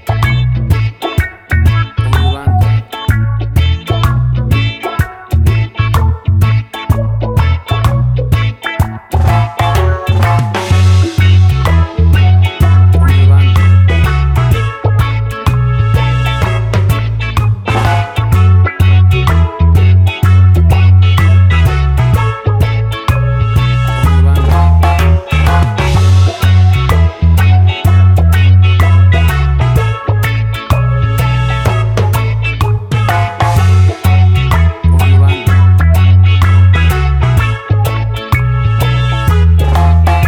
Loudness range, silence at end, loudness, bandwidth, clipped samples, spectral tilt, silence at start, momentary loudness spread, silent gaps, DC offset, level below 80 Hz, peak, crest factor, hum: 4 LU; 0 s; -10 LUFS; 15.5 kHz; under 0.1%; -6.5 dB/octave; 0.05 s; 6 LU; none; under 0.1%; -18 dBFS; 0 dBFS; 8 dB; none